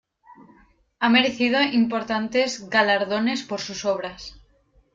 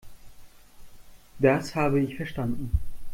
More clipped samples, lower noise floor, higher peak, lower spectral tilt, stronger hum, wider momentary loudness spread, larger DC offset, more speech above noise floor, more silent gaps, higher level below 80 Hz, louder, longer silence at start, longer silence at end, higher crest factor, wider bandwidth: neither; first, -60 dBFS vs -47 dBFS; about the same, -6 dBFS vs -8 dBFS; second, -3.5 dB/octave vs -7 dB/octave; neither; first, 11 LU vs 8 LU; neither; first, 38 dB vs 22 dB; neither; second, -58 dBFS vs -40 dBFS; first, -22 LUFS vs -27 LUFS; first, 0.3 s vs 0.05 s; first, 0.6 s vs 0 s; about the same, 18 dB vs 20 dB; second, 7.6 kHz vs 16.5 kHz